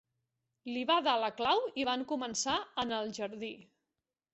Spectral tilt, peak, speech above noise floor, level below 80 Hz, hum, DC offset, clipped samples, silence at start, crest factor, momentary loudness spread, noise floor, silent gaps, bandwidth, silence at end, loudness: -0.5 dB/octave; -16 dBFS; 56 dB; -72 dBFS; none; under 0.1%; under 0.1%; 0.65 s; 20 dB; 13 LU; -90 dBFS; none; 8 kHz; 0.7 s; -33 LUFS